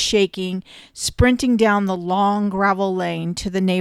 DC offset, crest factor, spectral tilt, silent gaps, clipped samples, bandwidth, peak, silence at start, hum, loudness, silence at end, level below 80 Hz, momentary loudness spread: under 0.1%; 16 dB; -5 dB/octave; none; under 0.1%; 13.5 kHz; -4 dBFS; 0 s; none; -19 LUFS; 0 s; -36 dBFS; 10 LU